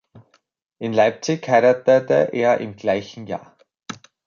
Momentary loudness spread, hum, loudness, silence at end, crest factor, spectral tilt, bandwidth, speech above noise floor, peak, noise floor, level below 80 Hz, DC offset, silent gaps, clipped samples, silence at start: 16 LU; none; -19 LUFS; 0.3 s; 18 dB; -5.5 dB/octave; 7.2 kHz; 34 dB; -4 dBFS; -53 dBFS; -64 dBFS; under 0.1%; none; under 0.1%; 0.15 s